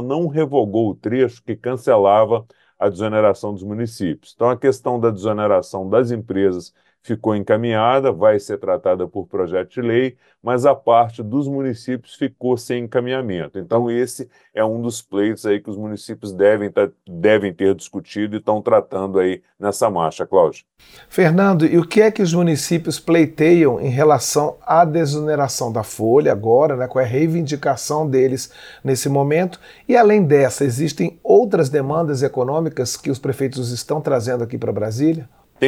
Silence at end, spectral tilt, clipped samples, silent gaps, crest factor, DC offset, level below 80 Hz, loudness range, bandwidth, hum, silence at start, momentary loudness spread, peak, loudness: 0 s; -6 dB/octave; under 0.1%; none; 16 dB; under 0.1%; -58 dBFS; 5 LU; 17.5 kHz; none; 0 s; 11 LU; -2 dBFS; -18 LUFS